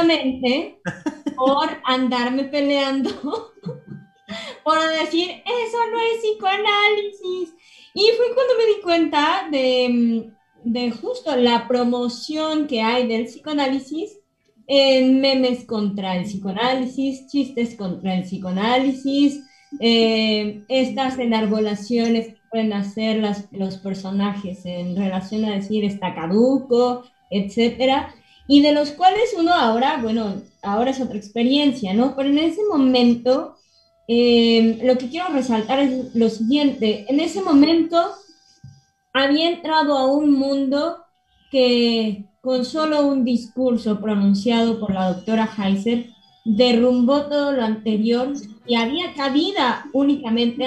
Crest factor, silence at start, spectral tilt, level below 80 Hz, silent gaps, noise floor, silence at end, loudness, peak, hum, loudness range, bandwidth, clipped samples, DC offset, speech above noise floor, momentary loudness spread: 18 dB; 0 s; -5.5 dB/octave; -58 dBFS; none; -58 dBFS; 0 s; -20 LUFS; -2 dBFS; none; 4 LU; 9.4 kHz; under 0.1%; under 0.1%; 39 dB; 11 LU